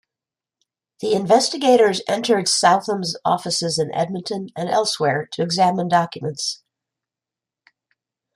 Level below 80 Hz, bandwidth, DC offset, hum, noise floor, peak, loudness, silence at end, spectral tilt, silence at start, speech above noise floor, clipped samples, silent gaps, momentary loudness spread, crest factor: -66 dBFS; 15 kHz; under 0.1%; none; -88 dBFS; -2 dBFS; -19 LUFS; 1.8 s; -3.5 dB/octave; 1 s; 69 dB; under 0.1%; none; 11 LU; 18 dB